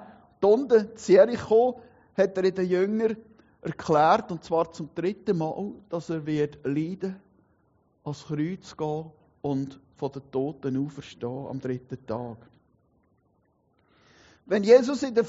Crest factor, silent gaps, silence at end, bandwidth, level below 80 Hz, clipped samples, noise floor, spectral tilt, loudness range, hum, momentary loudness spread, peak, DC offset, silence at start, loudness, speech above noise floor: 20 dB; none; 0 s; 7.6 kHz; -66 dBFS; under 0.1%; -68 dBFS; -6 dB/octave; 11 LU; none; 17 LU; -6 dBFS; under 0.1%; 0 s; -26 LUFS; 43 dB